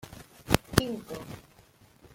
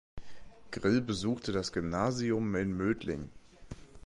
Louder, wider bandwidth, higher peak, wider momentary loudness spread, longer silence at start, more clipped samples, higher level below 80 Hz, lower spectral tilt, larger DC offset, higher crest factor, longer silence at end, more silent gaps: first, -29 LUFS vs -33 LUFS; first, 16.5 kHz vs 11.5 kHz; first, 0 dBFS vs -16 dBFS; first, 22 LU vs 18 LU; about the same, 0.05 s vs 0.15 s; neither; first, -46 dBFS vs -54 dBFS; second, -4.5 dB/octave vs -6 dB/octave; neither; first, 32 dB vs 18 dB; first, 0.75 s vs 0 s; neither